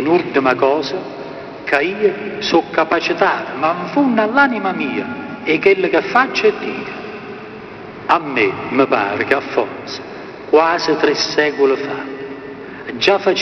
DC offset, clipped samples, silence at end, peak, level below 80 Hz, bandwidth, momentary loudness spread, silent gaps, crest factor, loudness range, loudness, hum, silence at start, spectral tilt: under 0.1%; under 0.1%; 0 s; 0 dBFS; -56 dBFS; 6.6 kHz; 16 LU; none; 16 dB; 3 LU; -16 LUFS; none; 0 s; -2.5 dB/octave